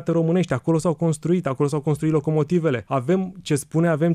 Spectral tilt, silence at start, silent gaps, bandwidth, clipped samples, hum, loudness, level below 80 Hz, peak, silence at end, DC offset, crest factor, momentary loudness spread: -7.5 dB/octave; 0 s; none; 13.5 kHz; under 0.1%; none; -22 LUFS; -56 dBFS; -8 dBFS; 0 s; under 0.1%; 12 dB; 3 LU